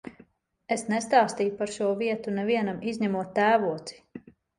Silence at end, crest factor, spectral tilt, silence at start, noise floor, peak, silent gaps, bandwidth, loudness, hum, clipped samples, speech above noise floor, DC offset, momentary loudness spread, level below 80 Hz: 0.4 s; 20 dB; -5 dB/octave; 0.05 s; -58 dBFS; -8 dBFS; none; 11.5 kHz; -26 LUFS; none; under 0.1%; 32 dB; under 0.1%; 20 LU; -68 dBFS